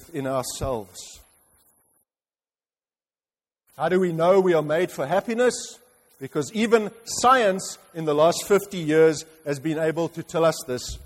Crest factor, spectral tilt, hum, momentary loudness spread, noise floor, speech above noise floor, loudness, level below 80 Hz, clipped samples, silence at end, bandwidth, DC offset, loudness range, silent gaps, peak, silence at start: 18 dB; -4.5 dB/octave; none; 13 LU; under -90 dBFS; over 67 dB; -23 LUFS; -52 dBFS; under 0.1%; 0 s; 16 kHz; under 0.1%; 12 LU; none; -6 dBFS; 0 s